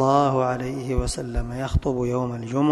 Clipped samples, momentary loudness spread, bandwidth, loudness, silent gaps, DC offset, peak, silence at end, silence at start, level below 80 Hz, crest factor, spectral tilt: under 0.1%; 9 LU; 12.5 kHz; -25 LUFS; none; under 0.1%; -4 dBFS; 0 s; 0 s; -32 dBFS; 18 dB; -6.5 dB/octave